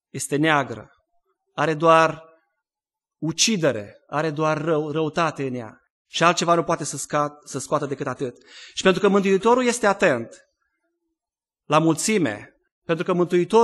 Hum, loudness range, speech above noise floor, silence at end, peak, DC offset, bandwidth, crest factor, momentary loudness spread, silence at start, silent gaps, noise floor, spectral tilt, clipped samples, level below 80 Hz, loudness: none; 3 LU; over 69 dB; 0 s; -2 dBFS; under 0.1%; 12.5 kHz; 20 dB; 14 LU; 0.15 s; 5.90-6.05 s, 12.72-12.82 s; under -90 dBFS; -4.5 dB/octave; under 0.1%; -64 dBFS; -21 LUFS